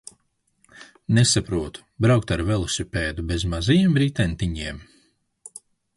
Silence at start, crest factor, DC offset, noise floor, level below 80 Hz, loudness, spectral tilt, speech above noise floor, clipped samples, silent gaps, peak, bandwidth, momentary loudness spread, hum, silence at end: 0.8 s; 18 dB; under 0.1%; -69 dBFS; -38 dBFS; -22 LUFS; -5 dB/octave; 48 dB; under 0.1%; none; -6 dBFS; 11.5 kHz; 20 LU; none; 1.15 s